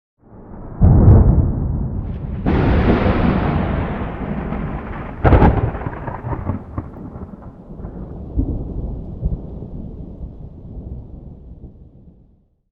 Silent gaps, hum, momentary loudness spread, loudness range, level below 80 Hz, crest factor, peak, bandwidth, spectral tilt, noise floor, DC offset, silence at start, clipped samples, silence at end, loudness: none; none; 23 LU; 15 LU; -24 dBFS; 18 dB; 0 dBFS; 5 kHz; -11 dB/octave; -54 dBFS; under 0.1%; 0.3 s; under 0.1%; 0.85 s; -18 LUFS